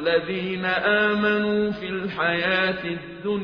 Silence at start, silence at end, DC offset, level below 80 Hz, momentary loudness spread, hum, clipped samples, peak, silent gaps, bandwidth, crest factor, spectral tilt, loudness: 0 s; 0 s; under 0.1%; -56 dBFS; 9 LU; none; under 0.1%; -8 dBFS; none; 6.4 kHz; 16 dB; -3 dB/octave; -23 LUFS